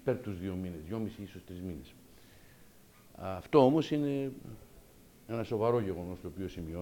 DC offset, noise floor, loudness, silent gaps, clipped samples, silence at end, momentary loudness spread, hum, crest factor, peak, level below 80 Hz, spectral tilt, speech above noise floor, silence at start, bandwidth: under 0.1%; -58 dBFS; -33 LUFS; none; under 0.1%; 0 s; 20 LU; none; 24 dB; -12 dBFS; -60 dBFS; -7.5 dB/octave; 25 dB; 0 s; 17.5 kHz